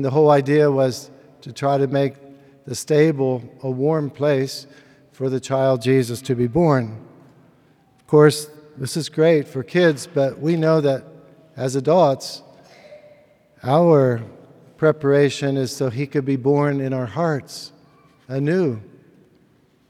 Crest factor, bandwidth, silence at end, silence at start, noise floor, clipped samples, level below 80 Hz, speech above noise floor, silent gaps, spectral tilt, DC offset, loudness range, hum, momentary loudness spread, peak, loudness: 20 dB; 14.5 kHz; 1.05 s; 0 s; -57 dBFS; under 0.1%; -60 dBFS; 39 dB; none; -6.5 dB/octave; under 0.1%; 3 LU; none; 16 LU; 0 dBFS; -19 LUFS